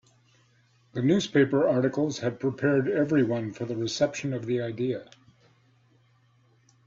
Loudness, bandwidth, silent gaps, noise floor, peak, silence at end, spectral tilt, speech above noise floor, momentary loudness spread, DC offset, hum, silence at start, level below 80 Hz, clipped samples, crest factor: -26 LUFS; 7.8 kHz; none; -63 dBFS; -10 dBFS; 1.8 s; -6 dB/octave; 38 dB; 9 LU; under 0.1%; none; 0.95 s; -66 dBFS; under 0.1%; 18 dB